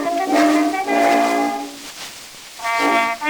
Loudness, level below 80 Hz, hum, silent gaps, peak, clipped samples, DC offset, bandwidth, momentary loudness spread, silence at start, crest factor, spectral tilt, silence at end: -17 LUFS; -60 dBFS; none; none; -2 dBFS; under 0.1%; under 0.1%; over 20 kHz; 16 LU; 0 s; 16 dB; -2.5 dB/octave; 0 s